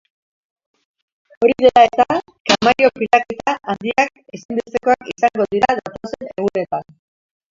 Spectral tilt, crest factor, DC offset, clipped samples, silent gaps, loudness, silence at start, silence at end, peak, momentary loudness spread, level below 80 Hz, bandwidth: -4 dB/octave; 18 dB; under 0.1%; under 0.1%; 2.40-2.45 s, 4.45-4.49 s; -17 LUFS; 1.4 s; 0.7 s; 0 dBFS; 13 LU; -54 dBFS; 7.6 kHz